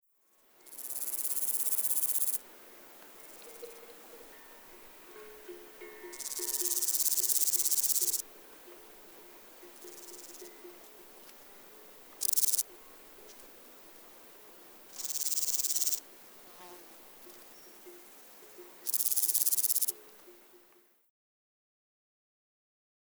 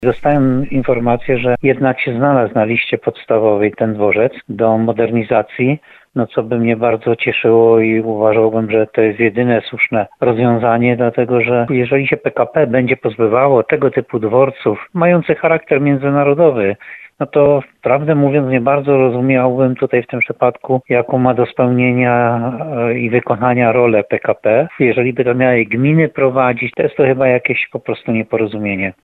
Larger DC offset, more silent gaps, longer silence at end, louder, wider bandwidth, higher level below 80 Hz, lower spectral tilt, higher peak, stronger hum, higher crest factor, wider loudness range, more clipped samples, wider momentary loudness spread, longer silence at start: neither; neither; first, 2.75 s vs 0.15 s; second, -29 LUFS vs -14 LUFS; first, over 20 kHz vs 4.2 kHz; second, -78 dBFS vs -48 dBFS; second, 2 dB/octave vs -10 dB/octave; second, -10 dBFS vs 0 dBFS; neither; first, 28 dB vs 14 dB; first, 18 LU vs 2 LU; neither; first, 25 LU vs 6 LU; first, 0.65 s vs 0 s